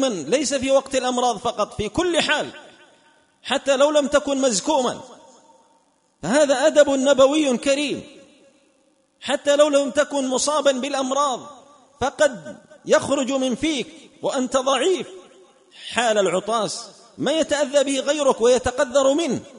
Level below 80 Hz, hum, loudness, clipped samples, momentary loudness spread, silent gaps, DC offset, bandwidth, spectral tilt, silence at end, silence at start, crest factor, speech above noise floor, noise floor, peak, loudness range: -54 dBFS; none; -20 LUFS; under 0.1%; 11 LU; none; under 0.1%; 11 kHz; -3 dB/octave; 0 s; 0 s; 18 dB; 42 dB; -62 dBFS; -2 dBFS; 3 LU